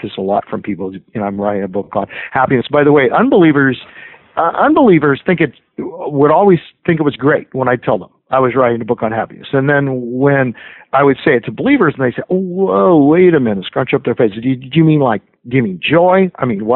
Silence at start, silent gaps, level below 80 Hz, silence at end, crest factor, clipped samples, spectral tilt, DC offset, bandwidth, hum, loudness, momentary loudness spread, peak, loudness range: 0.05 s; none; -50 dBFS; 0 s; 12 dB; under 0.1%; -12.5 dB/octave; under 0.1%; 4.2 kHz; none; -13 LUFS; 11 LU; 0 dBFS; 3 LU